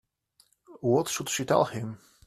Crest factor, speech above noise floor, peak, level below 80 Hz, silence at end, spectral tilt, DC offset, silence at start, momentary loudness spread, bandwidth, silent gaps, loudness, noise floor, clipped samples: 22 dB; 39 dB; -8 dBFS; -66 dBFS; 0.3 s; -4.5 dB/octave; under 0.1%; 0.7 s; 11 LU; 15.5 kHz; none; -27 LUFS; -66 dBFS; under 0.1%